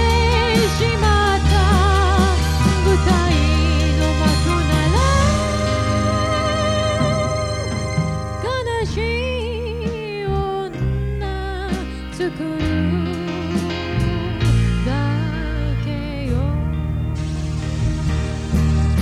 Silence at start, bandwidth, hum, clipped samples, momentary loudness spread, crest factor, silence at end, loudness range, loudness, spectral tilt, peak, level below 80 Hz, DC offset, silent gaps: 0 s; 12.5 kHz; none; under 0.1%; 9 LU; 14 dB; 0 s; 7 LU; -19 LUFS; -5.5 dB/octave; -4 dBFS; -24 dBFS; under 0.1%; none